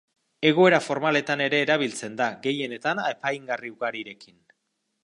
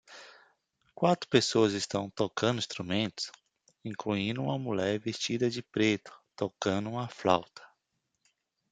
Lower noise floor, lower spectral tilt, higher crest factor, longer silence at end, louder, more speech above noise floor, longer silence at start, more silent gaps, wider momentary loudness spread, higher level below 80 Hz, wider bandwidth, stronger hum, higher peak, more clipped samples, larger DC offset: second, -77 dBFS vs -82 dBFS; about the same, -4.5 dB/octave vs -5 dB/octave; about the same, 22 dB vs 24 dB; second, 0.8 s vs 1.05 s; first, -24 LUFS vs -31 LUFS; about the same, 53 dB vs 51 dB; first, 0.4 s vs 0.1 s; neither; about the same, 12 LU vs 12 LU; second, -76 dBFS vs -70 dBFS; first, 11.5 kHz vs 9.4 kHz; neither; first, -4 dBFS vs -8 dBFS; neither; neither